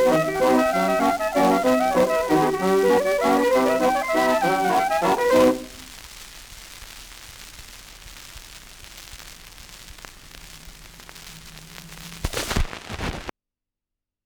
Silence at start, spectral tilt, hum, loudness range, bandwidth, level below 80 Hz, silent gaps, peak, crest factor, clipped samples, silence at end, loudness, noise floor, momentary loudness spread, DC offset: 0 s; -4.5 dB/octave; none; 21 LU; over 20 kHz; -40 dBFS; none; -6 dBFS; 18 dB; under 0.1%; 0.95 s; -20 LUFS; -87 dBFS; 22 LU; under 0.1%